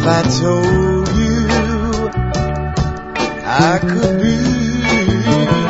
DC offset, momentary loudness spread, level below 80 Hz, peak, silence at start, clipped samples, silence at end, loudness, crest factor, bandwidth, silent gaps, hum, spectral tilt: under 0.1%; 6 LU; -26 dBFS; 0 dBFS; 0 s; under 0.1%; 0 s; -15 LUFS; 14 dB; 8 kHz; none; none; -6 dB/octave